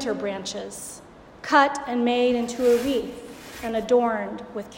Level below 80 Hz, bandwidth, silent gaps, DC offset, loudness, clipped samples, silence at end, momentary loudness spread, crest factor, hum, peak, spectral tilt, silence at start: -56 dBFS; 16.5 kHz; none; under 0.1%; -23 LUFS; under 0.1%; 0 s; 18 LU; 18 dB; none; -6 dBFS; -3.5 dB/octave; 0 s